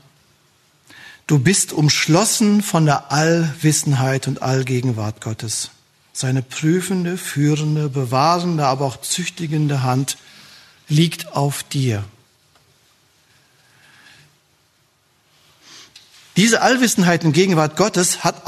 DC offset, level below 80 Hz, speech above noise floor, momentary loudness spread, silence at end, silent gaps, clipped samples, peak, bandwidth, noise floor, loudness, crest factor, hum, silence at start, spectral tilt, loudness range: under 0.1%; -60 dBFS; 43 dB; 9 LU; 0.05 s; none; under 0.1%; 0 dBFS; 13.5 kHz; -60 dBFS; -18 LUFS; 18 dB; none; 1 s; -4.5 dB/octave; 7 LU